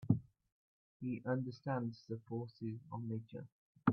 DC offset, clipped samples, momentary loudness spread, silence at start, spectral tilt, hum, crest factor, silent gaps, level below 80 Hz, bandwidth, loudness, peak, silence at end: under 0.1%; under 0.1%; 11 LU; 0 s; -8.5 dB/octave; none; 24 dB; 0.52-1.00 s, 3.52-3.75 s; -76 dBFS; 6.4 kHz; -43 LUFS; -16 dBFS; 0 s